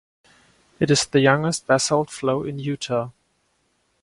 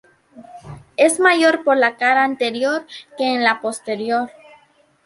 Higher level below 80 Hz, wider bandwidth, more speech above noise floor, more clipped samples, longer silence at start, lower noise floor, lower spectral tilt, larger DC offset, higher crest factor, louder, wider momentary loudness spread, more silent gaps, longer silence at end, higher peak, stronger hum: about the same, -58 dBFS vs -62 dBFS; about the same, 11.5 kHz vs 11.5 kHz; first, 47 dB vs 38 dB; neither; first, 0.8 s vs 0.35 s; first, -68 dBFS vs -55 dBFS; first, -4.5 dB/octave vs -2.5 dB/octave; neither; about the same, 22 dB vs 18 dB; second, -21 LUFS vs -17 LUFS; second, 10 LU vs 17 LU; neither; first, 0.95 s vs 0.75 s; about the same, -2 dBFS vs -2 dBFS; neither